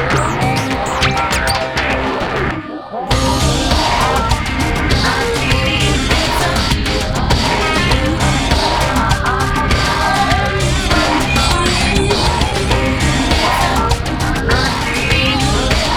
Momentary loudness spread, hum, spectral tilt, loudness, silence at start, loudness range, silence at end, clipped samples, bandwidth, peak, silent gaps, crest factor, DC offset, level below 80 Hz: 4 LU; none; -4 dB/octave; -14 LUFS; 0 s; 2 LU; 0 s; under 0.1%; 18.5 kHz; 0 dBFS; none; 14 dB; under 0.1%; -22 dBFS